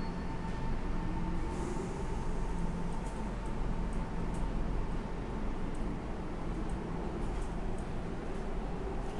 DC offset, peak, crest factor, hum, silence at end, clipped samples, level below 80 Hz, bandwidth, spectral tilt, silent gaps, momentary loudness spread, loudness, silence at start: 0.2%; -22 dBFS; 14 dB; none; 0 s; under 0.1%; -38 dBFS; 11 kHz; -7 dB/octave; none; 2 LU; -39 LUFS; 0 s